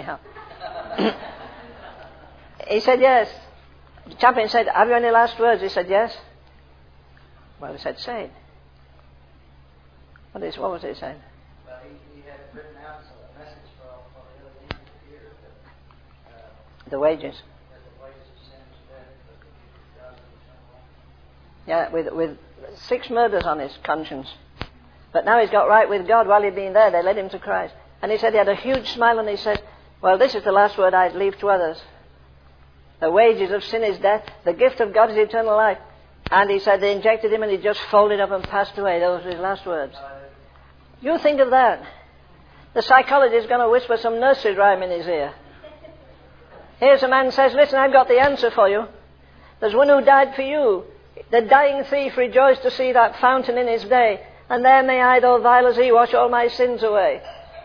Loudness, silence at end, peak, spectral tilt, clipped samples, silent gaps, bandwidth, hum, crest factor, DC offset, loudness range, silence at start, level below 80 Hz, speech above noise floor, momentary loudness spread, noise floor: -18 LUFS; 0.05 s; 0 dBFS; -5.5 dB/octave; under 0.1%; none; 5.4 kHz; none; 20 dB; 0.1%; 17 LU; 0 s; -52 dBFS; 33 dB; 18 LU; -51 dBFS